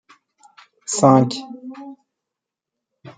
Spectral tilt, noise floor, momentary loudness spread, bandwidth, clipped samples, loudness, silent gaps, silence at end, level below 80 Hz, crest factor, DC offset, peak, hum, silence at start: -6 dB/octave; -85 dBFS; 24 LU; 9.6 kHz; under 0.1%; -17 LUFS; none; 0.05 s; -66 dBFS; 20 dB; under 0.1%; -2 dBFS; none; 0.9 s